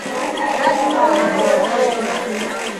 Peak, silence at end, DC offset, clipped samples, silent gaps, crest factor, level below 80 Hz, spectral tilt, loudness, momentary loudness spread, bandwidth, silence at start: -2 dBFS; 0 s; under 0.1%; under 0.1%; none; 14 dB; -56 dBFS; -3.5 dB/octave; -17 LUFS; 7 LU; 14.5 kHz; 0 s